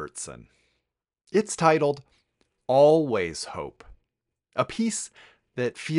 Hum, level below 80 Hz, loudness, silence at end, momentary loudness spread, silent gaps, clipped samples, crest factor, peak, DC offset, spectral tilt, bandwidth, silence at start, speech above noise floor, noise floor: none; -60 dBFS; -24 LUFS; 0 s; 20 LU; none; under 0.1%; 22 dB; -4 dBFS; under 0.1%; -5 dB/octave; 11.5 kHz; 0 s; 57 dB; -82 dBFS